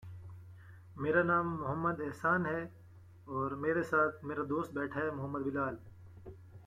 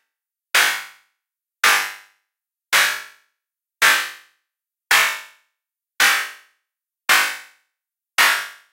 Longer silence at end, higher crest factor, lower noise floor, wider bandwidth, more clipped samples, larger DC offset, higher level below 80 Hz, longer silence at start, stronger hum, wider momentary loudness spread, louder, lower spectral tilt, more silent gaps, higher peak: second, 0 s vs 0.2 s; about the same, 20 dB vs 22 dB; second, -56 dBFS vs -83 dBFS; about the same, 15 kHz vs 16 kHz; neither; neither; first, -66 dBFS vs -74 dBFS; second, 0 s vs 0.55 s; neither; first, 22 LU vs 13 LU; second, -34 LUFS vs -17 LUFS; first, -8 dB/octave vs 2.5 dB/octave; neither; second, -16 dBFS vs 0 dBFS